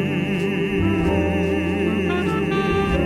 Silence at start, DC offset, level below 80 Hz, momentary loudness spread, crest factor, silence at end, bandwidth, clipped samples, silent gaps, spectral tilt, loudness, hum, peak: 0 s; under 0.1%; -36 dBFS; 2 LU; 12 dB; 0 s; 13.5 kHz; under 0.1%; none; -7 dB/octave; -21 LUFS; none; -8 dBFS